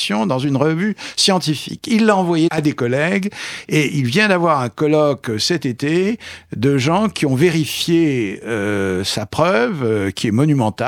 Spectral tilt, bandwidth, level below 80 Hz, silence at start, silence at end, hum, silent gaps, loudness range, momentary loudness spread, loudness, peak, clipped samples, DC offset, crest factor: -5 dB/octave; 17.5 kHz; -54 dBFS; 0 s; 0 s; none; none; 1 LU; 6 LU; -17 LUFS; 0 dBFS; under 0.1%; under 0.1%; 16 dB